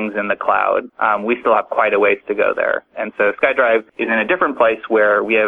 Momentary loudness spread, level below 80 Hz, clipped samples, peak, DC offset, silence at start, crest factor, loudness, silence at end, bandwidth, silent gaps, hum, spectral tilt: 5 LU; -58 dBFS; under 0.1%; 0 dBFS; under 0.1%; 0 s; 16 dB; -16 LUFS; 0 s; 4 kHz; none; none; -7 dB/octave